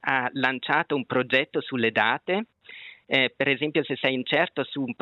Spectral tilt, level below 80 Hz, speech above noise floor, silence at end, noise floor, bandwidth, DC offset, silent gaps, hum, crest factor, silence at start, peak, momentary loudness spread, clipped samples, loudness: -6.5 dB/octave; -76 dBFS; 21 dB; 0.1 s; -46 dBFS; 7 kHz; under 0.1%; none; none; 22 dB; 0.05 s; -4 dBFS; 7 LU; under 0.1%; -25 LUFS